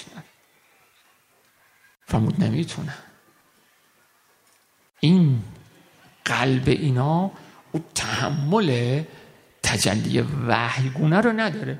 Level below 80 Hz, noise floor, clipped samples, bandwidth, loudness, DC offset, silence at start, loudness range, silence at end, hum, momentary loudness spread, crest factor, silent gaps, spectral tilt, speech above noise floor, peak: -50 dBFS; -61 dBFS; under 0.1%; 15 kHz; -22 LUFS; under 0.1%; 0 s; 7 LU; 0 s; none; 13 LU; 22 dB; none; -5.5 dB/octave; 40 dB; -2 dBFS